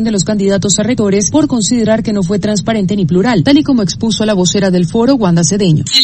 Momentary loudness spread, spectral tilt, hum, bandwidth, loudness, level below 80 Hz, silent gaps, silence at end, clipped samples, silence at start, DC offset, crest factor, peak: 4 LU; -4.5 dB/octave; none; 8.8 kHz; -11 LUFS; -38 dBFS; none; 0 s; under 0.1%; 0 s; under 0.1%; 10 dB; 0 dBFS